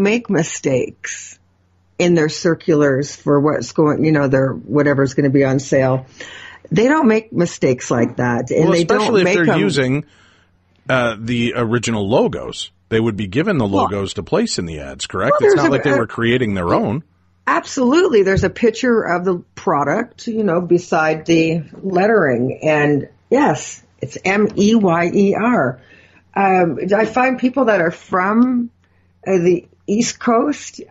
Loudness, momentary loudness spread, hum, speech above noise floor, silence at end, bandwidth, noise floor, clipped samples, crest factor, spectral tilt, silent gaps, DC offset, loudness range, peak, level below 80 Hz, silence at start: -16 LUFS; 9 LU; none; 41 dB; 0.05 s; 8.8 kHz; -57 dBFS; under 0.1%; 12 dB; -5.5 dB/octave; none; under 0.1%; 3 LU; -4 dBFS; -48 dBFS; 0 s